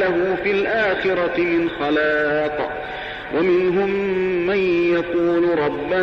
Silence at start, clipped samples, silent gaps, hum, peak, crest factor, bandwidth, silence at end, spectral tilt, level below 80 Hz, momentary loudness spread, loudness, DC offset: 0 s; under 0.1%; none; none; -10 dBFS; 10 dB; 6.2 kHz; 0 s; -7 dB/octave; -48 dBFS; 6 LU; -20 LUFS; under 0.1%